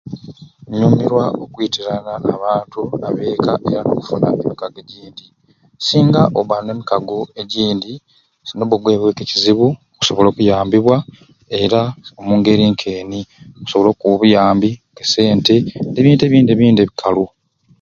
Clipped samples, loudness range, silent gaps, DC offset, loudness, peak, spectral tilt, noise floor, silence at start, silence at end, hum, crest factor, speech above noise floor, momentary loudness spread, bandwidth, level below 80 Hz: under 0.1%; 6 LU; none; under 0.1%; -15 LUFS; 0 dBFS; -6.5 dB/octave; -37 dBFS; 0.05 s; 0.55 s; none; 16 dB; 22 dB; 14 LU; 7.6 kHz; -48 dBFS